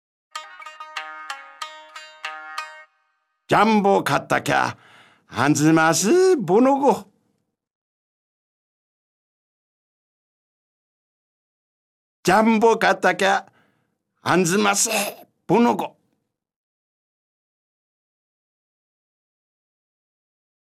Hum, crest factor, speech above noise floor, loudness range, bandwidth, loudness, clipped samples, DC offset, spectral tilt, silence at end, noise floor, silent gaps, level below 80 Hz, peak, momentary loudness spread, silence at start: none; 20 dB; 56 dB; 9 LU; 15.5 kHz; -19 LUFS; under 0.1%; under 0.1%; -4 dB/octave; 4.9 s; -74 dBFS; 7.75-12.23 s; -66 dBFS; -4 dBFS; 19 LU; 0.35 s